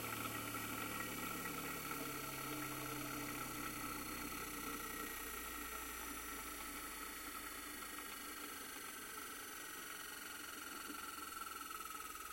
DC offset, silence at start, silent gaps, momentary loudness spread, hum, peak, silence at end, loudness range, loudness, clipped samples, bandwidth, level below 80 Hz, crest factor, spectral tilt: under 0.1%; 0 s; none; 4 LU; none; -30 dBFS; 0 s; 4 LU; -46 LUFS; under 0.1%; 16.5 kHz; -64 dBFS; 18 dB; -2.5 dB/octave